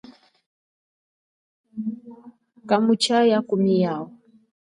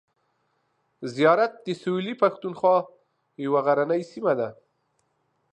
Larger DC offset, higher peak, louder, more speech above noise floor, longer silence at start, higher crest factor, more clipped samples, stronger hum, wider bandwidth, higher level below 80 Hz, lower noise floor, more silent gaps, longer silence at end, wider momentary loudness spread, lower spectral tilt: neither; about the same, -6 dBFS vs -6 dBFS; first, -21 LUFS vs -24 LUFS; first, over 70 dB vs 49 dB; first, 1.75 s vs 1 s; about the same, 18 dB vs 20 dB; neither; neither; first, 11.5 kHz vs 9.2 kHz; about the same, -74 dBFS vs -78 dBFS; first, under -90 dBFS vs -72 dBFS; neither; second, 0.7 s vs 1 s; first, 20 LU vs 13 LU; about the same, -5.5 dB/octave vs -6.5 dB/octave